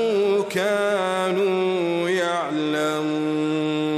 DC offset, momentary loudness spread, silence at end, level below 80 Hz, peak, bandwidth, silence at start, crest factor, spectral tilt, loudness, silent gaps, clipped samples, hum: under 0.1%; 3 LU; 0 s; -72 dBFS; -10 dBFS; 14.5 kHz; 0 s; 12 dB; -5 dB/octave; -22 LUFS; none; under 0.1%; none